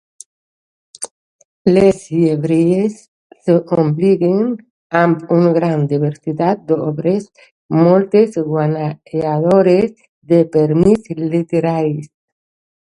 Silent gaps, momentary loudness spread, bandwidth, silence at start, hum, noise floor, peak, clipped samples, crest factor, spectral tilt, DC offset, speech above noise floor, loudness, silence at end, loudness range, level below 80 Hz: 1.11-1.39 s, 1.45-1.65 s, 3.08-3.30 s, 4.70-4.90 s, 7.51-7.69 s, 10.09-10.22 s; 10 LU; 11.5 kHz; 1 s; none; under -90 dBFS; 0 dBFS; under 0.1%; 14 dB; -8 dB/octave; under 0.1%; over 76 dB; -15 LUFS; 0.9 s; 2 LU; -50 dBFS